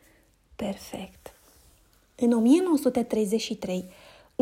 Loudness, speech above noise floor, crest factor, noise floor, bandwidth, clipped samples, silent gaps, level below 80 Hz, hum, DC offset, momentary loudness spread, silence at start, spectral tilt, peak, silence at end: -26 LUFS; 36 dB; 18 dB; -61 dBFS; 16 kHz; under 0.1%; none; -60 dBFS; none; under 0.1%; 19 LU; 0.6 s; -5.5 dB/octave; -10 dBFS; 0.5 s